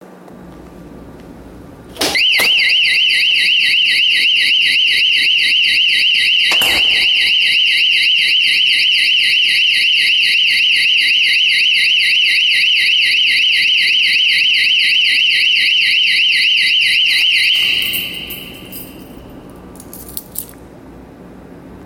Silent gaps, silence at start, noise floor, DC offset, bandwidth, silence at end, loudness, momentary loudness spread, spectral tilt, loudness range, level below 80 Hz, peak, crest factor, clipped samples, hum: none; 0.3 s; -36 dBFS; under 0.1%; 17 kHz; 0 s; -9 LUFS; 6 LU; 0.5 dB/octave; 4 LU; -48 dBFS; 0 dBFS; 14 dB; under 0.1%; none